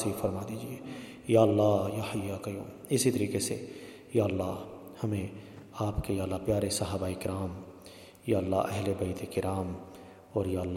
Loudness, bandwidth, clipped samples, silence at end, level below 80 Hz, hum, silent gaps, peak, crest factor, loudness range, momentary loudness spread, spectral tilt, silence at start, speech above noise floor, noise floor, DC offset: -32 LUFS; 16.5 kHz; under 0.1%; 0 s; -54 dBFS; none; none; -10 dBFS; 22 dB; 4 LU; 17 LU; -6 dB/octave; 0 s; 20 dB; -51 dBFS; under 0.1%